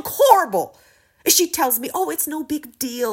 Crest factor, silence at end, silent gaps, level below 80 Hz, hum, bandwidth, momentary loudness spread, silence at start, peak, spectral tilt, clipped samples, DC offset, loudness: 20 dB; 0 s; none; -60 dBFS; none; 16.5 kHz; 13 LU; 0.05 s; 0 dBFS; -1.5 dB/octave; under 0.1%; under 0.1%; -19 LUFS